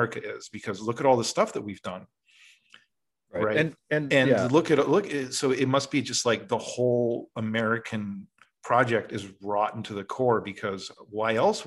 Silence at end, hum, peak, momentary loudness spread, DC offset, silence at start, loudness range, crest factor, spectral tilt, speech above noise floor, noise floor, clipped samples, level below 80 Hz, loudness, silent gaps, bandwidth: 0 s; none; -8 dBFS; 14 LU; under 0.1%; 0 s; 5 LU; 20 dB; -4.5 dB/octave; 47 dB; -73 dBFS; under 0.1%; -70 dBFS; -26 LUFS; none; 12.5 kHz